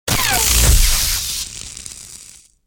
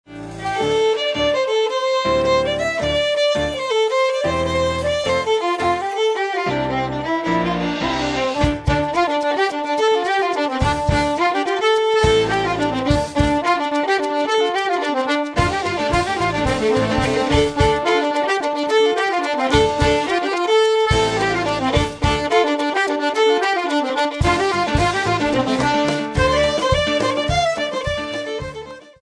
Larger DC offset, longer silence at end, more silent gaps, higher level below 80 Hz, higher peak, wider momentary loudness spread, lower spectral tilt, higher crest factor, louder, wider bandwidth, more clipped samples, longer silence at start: neither; first, 0.4 s vs 0.2 s; neither; first, -20 dBFS vs -34 dBFS; about the same, -2 dBFS vs -2 dBFS; first, 21 LU vs 4 LU; second, -1.5 dB/octave vs -5 dB/octave; about the same, 16 dB vs 16 dB; first, -14 LUFS vs -18 LUFS; first, over 20 kHz vs 11 kHz; neither; about the same, 0.05 s vs 0.1 s